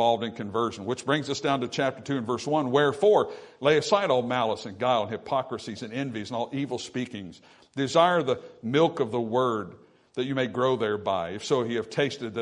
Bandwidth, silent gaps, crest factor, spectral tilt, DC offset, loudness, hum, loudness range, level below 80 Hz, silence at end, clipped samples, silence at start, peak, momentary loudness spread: 11 kHz; none; 20 dB; -5 dB/octave; under 0.1%; -27 LUFS; none; 4 LU; -70 dBFS; 0 s; under 0.1%; 0 s; -6 dBFS; 11 LU